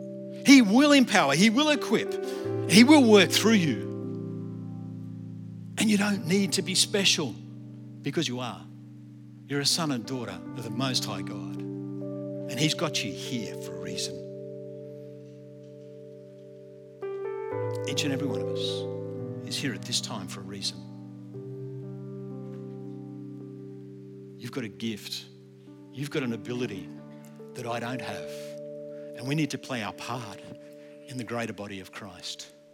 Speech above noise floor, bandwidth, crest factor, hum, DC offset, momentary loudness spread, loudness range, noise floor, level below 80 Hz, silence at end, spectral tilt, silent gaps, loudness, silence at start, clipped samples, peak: 23 dB; 17.5 kHz; 26 dB; none; under 0.1%; 24 LU; 17 LU; -49 dBFS; -80 dBFS; 0.25 s; -4 dB/octave; none; -26 LUFS; 0 s; under 0.1%; -2 dBFS